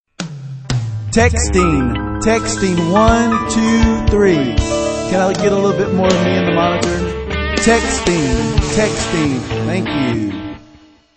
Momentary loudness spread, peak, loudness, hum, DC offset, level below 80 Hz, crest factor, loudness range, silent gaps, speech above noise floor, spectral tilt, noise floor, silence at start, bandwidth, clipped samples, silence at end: 8 LU; 0 dBFS; -15 LUFS; none; under 0.1%; -26 dBFS; 14 dB; 2 LU; none; 31 dB; -5 dB/octave; -45 dBFS; 0.2 s; 8.8 kHz; under 0.1%; 0.55 s